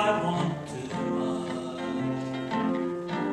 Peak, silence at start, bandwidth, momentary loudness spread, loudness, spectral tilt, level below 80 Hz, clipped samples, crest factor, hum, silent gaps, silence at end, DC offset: -12 dBFS; 0 s; 11 kHz; 6 LU; -30 LUFS; -6.5 dB/octave; -62 dBFS; under 0.1%; 18 dB; none; none; 0 s; under 0.1%